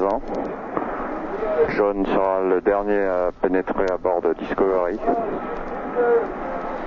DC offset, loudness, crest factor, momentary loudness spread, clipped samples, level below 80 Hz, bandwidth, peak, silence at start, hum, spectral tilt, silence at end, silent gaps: under 0.1%; -22 LUFS; 16 dB; 8 LU; under 0.1%; -42 dBFS; 6.8 kHz; -6 dBFS; 0 s; none; -8 dB/octave; 0 s; none